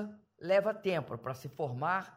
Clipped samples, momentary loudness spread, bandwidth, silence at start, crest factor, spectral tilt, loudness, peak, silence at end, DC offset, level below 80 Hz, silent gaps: under 0.1%; 13 LU; 16 kHz; 0 s; 16 dB; -6.5 dB/octave; -34 LUFS; -18 dBFS; 0.05 s; under 0.1%; -74 dBFS; none